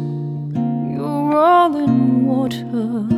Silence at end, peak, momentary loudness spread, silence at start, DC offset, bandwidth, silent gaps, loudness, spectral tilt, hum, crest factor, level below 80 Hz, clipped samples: 0 s; -2 dBFS; 10 LU; 0 s; under 0.1%; 13 kHz; none; -17 LUFS; -8.5 dB/octave; none; 14 dB; -54 dBFS; under 0.1%